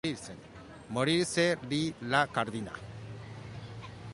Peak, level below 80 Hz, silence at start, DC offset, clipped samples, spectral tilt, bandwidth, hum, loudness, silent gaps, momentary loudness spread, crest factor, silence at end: -12 dBFS; -60 dBFS; 0.05 s; under 0.1%; under 0.1%; -4.5 dB/octave; 11.5 kHz; none; -31 LUFS; none; 17 LU; 20 dB; 0 s